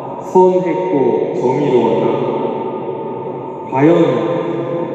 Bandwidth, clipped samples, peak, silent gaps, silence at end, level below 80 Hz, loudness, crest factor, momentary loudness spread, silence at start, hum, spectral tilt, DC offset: 7.8 kHz; under 0.1%; 0 dBFS; none; 0 s; -62 dBFS; -15 LUFS; 14 dB; 12 LU; 0 s; none; -8.5 dB/octave; under 0.1%